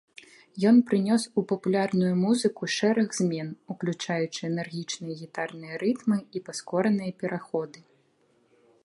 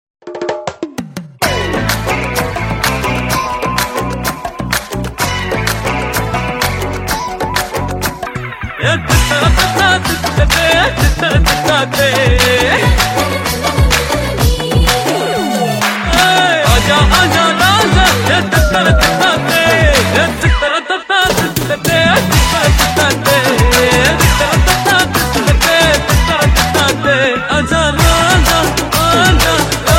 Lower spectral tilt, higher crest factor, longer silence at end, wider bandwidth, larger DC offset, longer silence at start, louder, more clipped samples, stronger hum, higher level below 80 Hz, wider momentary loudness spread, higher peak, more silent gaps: first, -5.5 dB/octave vs -4 dB/octave; about the same, 16 dB vs 12 dB; first, 1.15 s vs 0 s; second, 11.5 kHz vs 17 kHz; neither; first, 0.55 s vs 0.25 s; second, -27 LUFS vs -11 LUFS; neither; neither; second, -74 dBFS vs -20 dBFS; first, 12 LU vs 8 LU; second, -10 dBFS vs 0 dBFS; neither